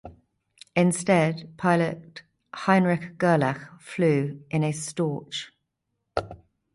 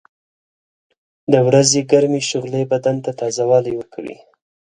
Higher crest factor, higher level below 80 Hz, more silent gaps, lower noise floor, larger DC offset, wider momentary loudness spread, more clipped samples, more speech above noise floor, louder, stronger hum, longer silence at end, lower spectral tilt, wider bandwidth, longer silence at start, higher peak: about the same, 18 dB vs 18 dB; about the same, -58 dBFS vs -60 dBFS; neither; second, -79 dBFS vs under -90 dBFS; neither; second, 15 LU vs 18 LU; neither; second, 55 dB vs over 74 dB; second, -25 LUFS vs -16 LUFS; neither; second, 0.4 s vs 0.65 s; first, -6 dB/octave vs -4.5 dB/octave; about the same, 11.5 kHz vs 11 kHz; second, 0.05 s vs 1.3 s; second, -6 dBFS vs 0 dBFS